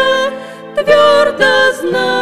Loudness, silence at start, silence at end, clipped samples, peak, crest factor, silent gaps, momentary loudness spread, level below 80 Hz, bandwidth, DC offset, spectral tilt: -11 LUFS; 0 s; 0 s; under 0.1%; 0 dBFS; 12 dB; none; 11 LU; -50 dBFS; 14.5 kHz; under 0.1%; -3 dB/octave